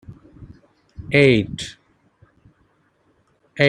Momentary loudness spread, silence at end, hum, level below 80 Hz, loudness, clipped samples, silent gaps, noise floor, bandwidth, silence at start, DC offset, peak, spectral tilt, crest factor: 25 LU; 0 s; none; -50 dBFS; -17 LUFS; under 0.1%; none; -62 dBFS; 11 kHz; 0.1 s; under 0.1%; 0 dBFS; -6 dB/octave; 22 dB